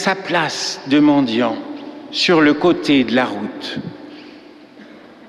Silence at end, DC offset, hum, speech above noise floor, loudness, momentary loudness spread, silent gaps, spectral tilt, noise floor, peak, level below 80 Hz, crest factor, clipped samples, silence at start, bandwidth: 0.3 s; under 0.1%; none; 25 dB; -16 LUFS; 19 LU; none; -4.5 dB/octave; -41 dBFS; -2 dBFS; -56 dBFS; 16 dB; under 0.1%; 0 s; 11 kHz